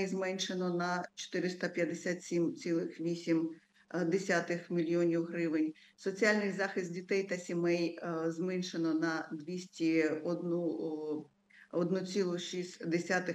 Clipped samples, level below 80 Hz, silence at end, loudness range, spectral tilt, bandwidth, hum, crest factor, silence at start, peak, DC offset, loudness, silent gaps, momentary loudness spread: under 0.1%; -88 dBFS; 0 s; 2 LU; -5.5 dB/octave; 9.4 kHz; none; 20 dB; 0 s; -16 dBFS; under 0.1%; -35 LUFS; none; 8 LU